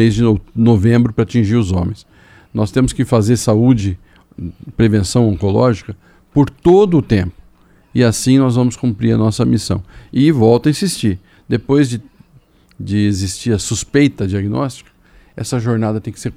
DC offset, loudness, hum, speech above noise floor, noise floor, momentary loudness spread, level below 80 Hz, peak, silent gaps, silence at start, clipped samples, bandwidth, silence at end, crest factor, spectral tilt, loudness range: under 0.1%; -15 LUFS; none; 35 dB; -49 dBFS; 12 LU; -38 dBFS; 0 dBFS; none; 0 s; under 0.1%; 14.5 kHz; 0 s; 14 dB; -6.5 dB/octave; 4 LU